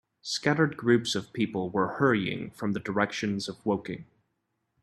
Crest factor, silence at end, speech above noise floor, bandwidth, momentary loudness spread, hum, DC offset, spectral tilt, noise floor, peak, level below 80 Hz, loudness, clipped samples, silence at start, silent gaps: 20 dB; 0.8 s; 51 dB; 13 kHz; 9 LU; none; under 0.1%; -5 dB/octave; -79 dBFS; -8 dBFS; -66 dBFS; -28 LUFS; under 0.1%; 0.25 s; none